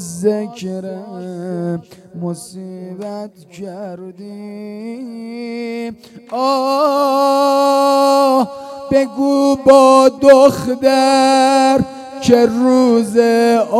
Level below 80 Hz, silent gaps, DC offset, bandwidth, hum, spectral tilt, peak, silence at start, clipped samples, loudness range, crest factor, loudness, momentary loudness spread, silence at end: -54 dBFS; none; under 0.1%; 14 kHz; none; -5 dB/octave; 0 dBFS; 0 s; 0.3%; 17 LU; 14 dB; -13 LUFS; 20 LU; 0 s